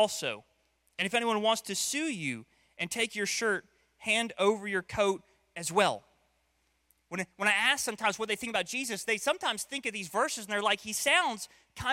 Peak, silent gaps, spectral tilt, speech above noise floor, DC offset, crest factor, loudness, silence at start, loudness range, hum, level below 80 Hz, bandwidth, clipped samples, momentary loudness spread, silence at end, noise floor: -10 dBFS; none; -2 dB/octave; 43 dB; under 0.1%; 22 dB; -30 LUFS; 0 s; 2 LU; none; -66 dBFS; 16.5 kHz; under 0.1%; 12 LU; 0 s; -74 dBFS